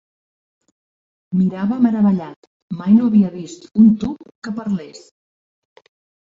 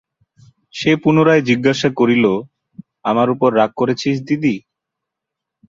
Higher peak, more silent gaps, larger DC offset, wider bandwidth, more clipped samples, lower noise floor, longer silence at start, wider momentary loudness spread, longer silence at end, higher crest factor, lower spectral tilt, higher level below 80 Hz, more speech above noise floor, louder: about the same, -2 dBFS vs -2 dBFS; first, 2.36-2.68 s, 4.35-4.42 s vs none; neither; about the same, 7.6 kHz vs 7.6 kHz; neither; first, under -90 dBFS vs -82 dBFS; first, 1.3 s vs 0.75 s; first, 18 LU vs 9 LU; first, 1.3 s vs 1.1 s; about the same, 16 dB vs 16 dB; first, -8.5 dB/octave vs -6.5 dB/octave; about the same, -56 dBFS vs -56 dBFS; first, over 73 dB vs 67 dB; about the same, -17 LUFS vs -16 LUFS